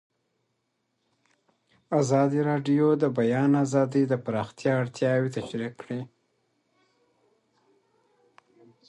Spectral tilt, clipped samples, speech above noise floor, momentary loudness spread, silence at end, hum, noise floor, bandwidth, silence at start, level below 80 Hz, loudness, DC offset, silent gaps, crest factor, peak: -7 dB/octave; under 0.1%; 52 dB; 12 LU; 2.8 s; none; -77 dBFS; 11 kHz; 1.9 s; -70 dBFS; -25 LUFS; under 0.1%; none; 18 dB; -10 dBFS